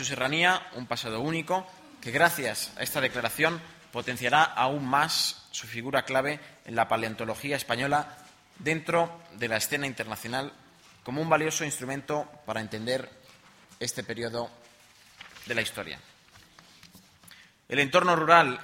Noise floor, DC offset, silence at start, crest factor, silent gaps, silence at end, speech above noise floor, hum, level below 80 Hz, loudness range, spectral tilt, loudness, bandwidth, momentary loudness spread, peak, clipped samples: -57 dBFS; under 0.1%; 0 s; 26 dB; none; 0 s; 29 dB; none; -66 dBFS; 9 LU; -3.5 dB/octave; -28 LUFS; 16.5 kHz; 14 LU; -4 dBFS; under 0.1%